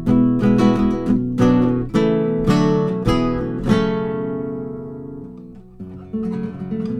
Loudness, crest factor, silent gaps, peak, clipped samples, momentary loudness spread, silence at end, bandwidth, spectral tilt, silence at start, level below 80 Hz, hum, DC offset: -19 LUFS; 16 dB; none; -2 dBFS; under 0.1%; 18 LU; 0 s; 10.5 kHz; -8 dB/octave; 0 s; -36 dBFS; none; under 0.1%